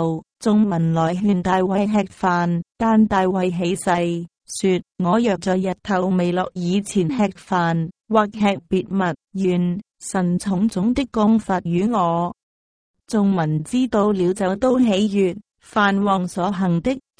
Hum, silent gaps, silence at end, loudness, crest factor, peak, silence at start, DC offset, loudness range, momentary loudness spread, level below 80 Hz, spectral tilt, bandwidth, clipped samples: none; 12.43-12.94 s; 0.2 s; -20 LUFS; 16 dB; -4 dBFS; 0 s; under 0.1%; 2 LU; 6 LU; -50 dBFS; -6.5 dB/octave; 10.5 kHz; under 0.1%